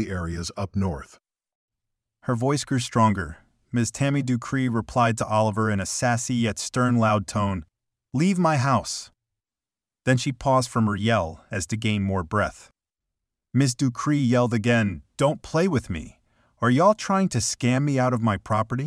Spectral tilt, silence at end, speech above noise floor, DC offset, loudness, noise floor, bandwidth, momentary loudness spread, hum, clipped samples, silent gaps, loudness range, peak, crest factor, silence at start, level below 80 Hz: -5.5 dB/octave; 0 s; over 67 dB; under 0.1%; -24 LUFS; under -90 dBFS; 13 kHz; 9 LU; none; under 0.1%; 1.55-1.68 s; 3 LU; -8 dBFS; 16 dB; 0 s; -50 dBFS